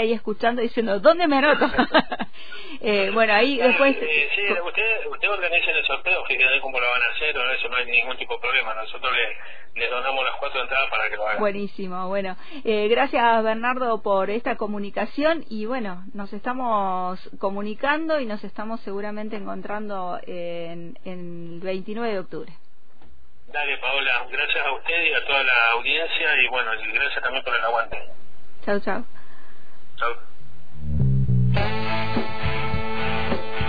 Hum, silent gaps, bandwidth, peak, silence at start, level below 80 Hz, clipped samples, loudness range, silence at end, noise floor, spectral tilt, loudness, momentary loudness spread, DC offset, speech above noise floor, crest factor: none; none; 5 kHz; -4 dBFS; 0 s; -44 dBFS; under 0.1%; 11 LU; 0 s; -55 dBFS; -8 dB/octave; -22 LUFS; 14 LU; 4%; 32 dB; 20 dB